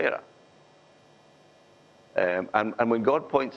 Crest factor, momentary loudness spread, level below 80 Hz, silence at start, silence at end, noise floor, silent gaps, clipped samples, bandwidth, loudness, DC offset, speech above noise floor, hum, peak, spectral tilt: 22 dB; 7 LU; -72 dBFS; 0 s; 0 s; -57 dBFS; none; under 0.1%; 7.6 kHz; -26 LUFS; under 0.1%; 32 dB; none; -6 dBFS; -7 dB/octave